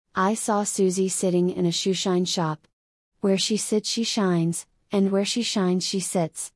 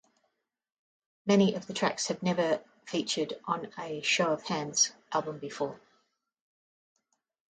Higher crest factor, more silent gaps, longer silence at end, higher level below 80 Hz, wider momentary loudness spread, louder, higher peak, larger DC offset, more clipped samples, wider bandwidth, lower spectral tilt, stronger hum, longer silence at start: second, 14 dB vs 20 dB; first, 2.73-3.12 s vs none; second, 0.05 s vs 1.75 s; about the same, -70 dBFS vs -74 dBFS; second, 4 LU vs 10 LU; first, -24 LUFS vs -30 LUFS; about the same, -10 dBFS vs -12 dBFS; neither; neither; first, 12 kHz vs 9.6 kHz; about the same, -4.5 dB/octave vs -3.5 dB/octave; neither; second, 0.15 s vs 1.25 s